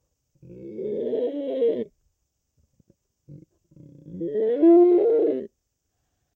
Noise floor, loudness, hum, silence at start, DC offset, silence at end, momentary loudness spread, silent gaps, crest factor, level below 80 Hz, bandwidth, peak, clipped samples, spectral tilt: -76 dBFS; -21 LUFS; none; 0.5 s; under 0.1%; 0.9 s; 23 LU; none; 16 dB; -70 dBFS; 4 kHz; -8 dBFS; under 0.1%; -10 dB/octave